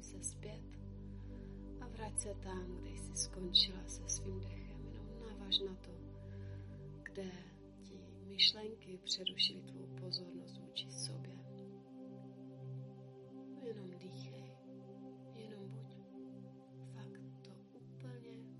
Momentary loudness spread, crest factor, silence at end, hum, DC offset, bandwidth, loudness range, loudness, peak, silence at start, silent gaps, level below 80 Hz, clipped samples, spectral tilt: 19 LU; 28 dB; 0 s; none; under 0.1%; 11.5 kHz; 15 LU; -41 LUFS; -18 dBFS; 0 s; none; -58 dBFS; under 0.1%; -3 dB/octave